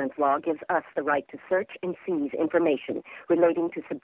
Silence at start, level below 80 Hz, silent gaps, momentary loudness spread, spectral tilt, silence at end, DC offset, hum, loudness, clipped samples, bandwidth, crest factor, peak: 0 s; -70 dBFS; none; 9 LU; -10 dB/octave; 0.05 s; under 0.1%; none; -27 LUFS; under 0.1%; 3.9 kHz; 18 dB; -8 dBFS